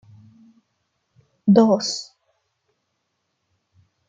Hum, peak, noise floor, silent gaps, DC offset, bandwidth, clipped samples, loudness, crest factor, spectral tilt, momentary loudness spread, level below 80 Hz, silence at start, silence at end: none; -2 dBFS; -75 dBFS; none; under 0.1%; 8.8 kHz; under 0.1%; -19 LUFS; 22 dB; -6 dB/octave; 17 LU; -68 dBFS; 1.45 s; 2.05 s